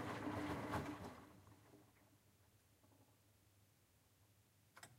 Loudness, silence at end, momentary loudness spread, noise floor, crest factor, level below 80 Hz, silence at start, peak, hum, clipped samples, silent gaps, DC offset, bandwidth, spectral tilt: -48 LUFS; 0 s; 22 LU; -75 dBFS; 20 dB; -72 dBFS; 0 s; -32 dBFS; none; under 0.1%; none; under 0.1%; 16 kHz; -6 dB/octave